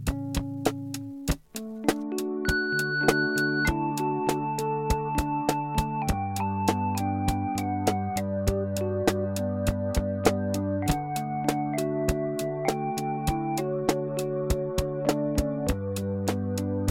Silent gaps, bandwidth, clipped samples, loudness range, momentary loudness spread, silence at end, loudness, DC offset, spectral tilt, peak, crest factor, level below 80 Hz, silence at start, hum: none; 16.5 kHz; under 0.1%; 2 LU; 5 LU; 0 s; -28 LUFS; 0.1%; -5.5 dB/octave; -6 dBFS; 22 dB; -38 dBFS; 0 s; none